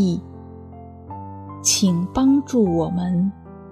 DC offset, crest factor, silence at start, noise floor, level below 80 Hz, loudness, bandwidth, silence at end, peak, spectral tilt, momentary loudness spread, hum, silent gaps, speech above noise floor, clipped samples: under 0.1%; 16 dB; 0 s; -39 dBFS; -48 dBFS; -20 LUFS; 14 kHz; 0 s; -4 dBFS; -5 dB/octave; 22 LU; none; none; 20 dB; under 0.1%